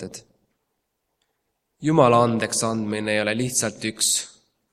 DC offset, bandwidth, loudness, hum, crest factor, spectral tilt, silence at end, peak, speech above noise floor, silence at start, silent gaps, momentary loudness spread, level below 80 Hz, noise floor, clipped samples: under 0.1%; 15.5 kHz; -21 LUFS; none; 22 dB; -3.5 dB/octave; 0.45 s; -2 dBFS; 55 dB; 0 s; none; 11 LU; -62 dBFS; -76 dBFS; under 0.1%